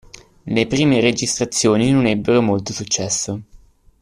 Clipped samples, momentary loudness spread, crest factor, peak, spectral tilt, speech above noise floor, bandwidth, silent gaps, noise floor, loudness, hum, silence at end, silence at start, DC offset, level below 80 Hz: under 0.1%; 8 LU; 16 dB; -2 dBFS; -4.5 dB/octave; 30 dB; 13.5 kHz; none; -47 dBFS; -17 LUFS; none; 0.45 s; 0.45 s; under 0.1%; -48 dBFS